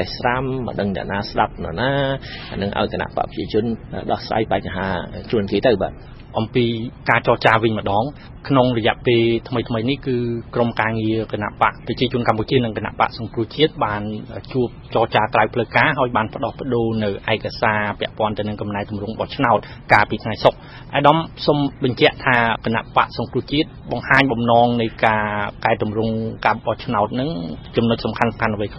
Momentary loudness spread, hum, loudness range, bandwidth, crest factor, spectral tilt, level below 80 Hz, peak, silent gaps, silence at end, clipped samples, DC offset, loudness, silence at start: 10 LU; none; 4 LU; 8 kHz; 20 dB; -8 dB/octave; -42 dBFS; 0 dBFS; none; 0 s; under 0.1%; under 0.1%; -20 LUFS; 0 s